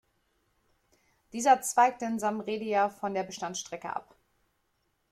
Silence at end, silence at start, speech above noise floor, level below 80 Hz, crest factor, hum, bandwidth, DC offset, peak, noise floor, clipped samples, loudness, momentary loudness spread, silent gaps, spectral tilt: 1.1 s; 1.35 s; 47 dB; -74 dBFS; 22 dB; none; 15 kHz; under 0.1%; -10 dBFS; -76 dBFS; under 0.1%; -29 LUFS; 13 LU; none; -3 dB/octave